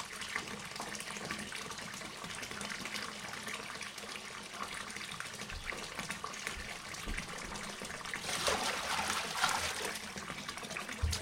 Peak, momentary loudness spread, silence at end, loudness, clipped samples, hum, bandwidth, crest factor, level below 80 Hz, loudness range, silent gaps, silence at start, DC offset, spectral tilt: -16 dBFS; 9 LU; 0 s; -39 LUFS; under 0.1%; none; 16 kHz; 24 dB; -52 dBFS; 6 LU; none; 0 s; under 0.1%; -2 dB/octave